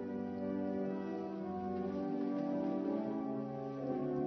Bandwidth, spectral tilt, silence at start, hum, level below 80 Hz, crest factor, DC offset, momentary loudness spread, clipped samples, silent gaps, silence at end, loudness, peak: 6.2 kHz; -8.5 dB/octave; 0 s; none; -76 dBFS; 14 dB; under 0.1%; 4 LU; under 0.1%; none; 0 s; -39 LUFS; -26 dBFS